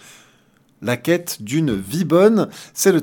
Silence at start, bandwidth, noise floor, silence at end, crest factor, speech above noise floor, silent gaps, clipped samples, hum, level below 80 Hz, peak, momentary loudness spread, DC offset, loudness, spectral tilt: 0.8 s; 18 kHz; -56 dBFS; 0 s; 16 dB; 39 dB; none; under 0.1%; none; -54 dBFS; -2 dBFS; 11 LU; under 0.1%; -19 LUFS; -5 dB/octave